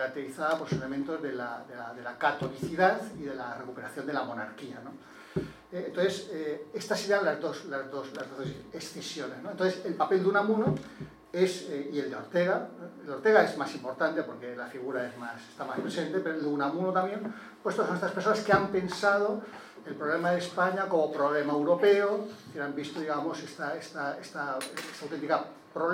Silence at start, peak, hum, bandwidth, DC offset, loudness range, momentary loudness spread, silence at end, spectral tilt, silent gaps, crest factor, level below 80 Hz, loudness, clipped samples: 0 s; -8 dBFS; none; 16 kHz; under 0.1%; 6 LU; 14 LU; 0 s; -5.5 dB/octave; none; 24 dB; -68 dBFS; -31 LUFS; under 0.1%